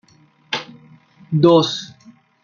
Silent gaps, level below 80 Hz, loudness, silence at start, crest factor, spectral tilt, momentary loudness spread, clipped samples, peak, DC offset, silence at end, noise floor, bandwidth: none; -62 dBFS; -18 LUFS; 0.5 s; 20 dB; -6 dB/octave; 15 LU; under 0.1%; 0 dBFS; under 0.1%; 0.55 s; -54 dBFS; 7.2 kHz